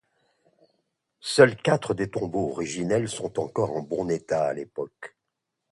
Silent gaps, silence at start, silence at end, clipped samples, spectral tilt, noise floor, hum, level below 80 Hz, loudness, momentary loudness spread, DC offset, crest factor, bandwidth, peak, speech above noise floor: none; 1.25 s; 0.65 s; under 0.1%; -5 dB/octave; -82 dBFS; none; -60 dBFS; -25 LUFS; 16 LU; under 0.1%; 24 dB; 11.5 kHz; -2 dBFS; 57 dB